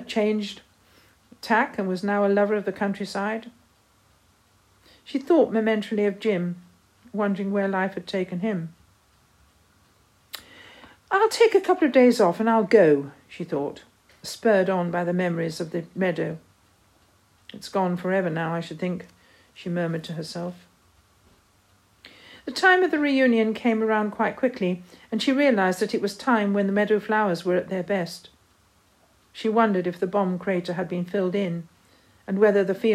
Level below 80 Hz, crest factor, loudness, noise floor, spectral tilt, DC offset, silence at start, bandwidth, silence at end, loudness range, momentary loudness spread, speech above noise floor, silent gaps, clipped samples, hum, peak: -68 dBFS; 20 dB; -24 LUFS; -61 dBFS; -6 dB/octave; under 0.1%; 0 s; 15 kHz; 0 s; 9 LU; 16 LU; 38 dB; none; under 0.1%; none; -4 dBFS